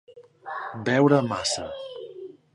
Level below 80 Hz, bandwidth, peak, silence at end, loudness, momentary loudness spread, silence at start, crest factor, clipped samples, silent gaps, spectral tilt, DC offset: -60 dBFS; 11.5 kHz; -6 dBFS; 0.2 s; -24 LUFS; 21 LU; 0.1 s; 22 dB; under 0.1%; none; -5 dB/octave; under 0.1%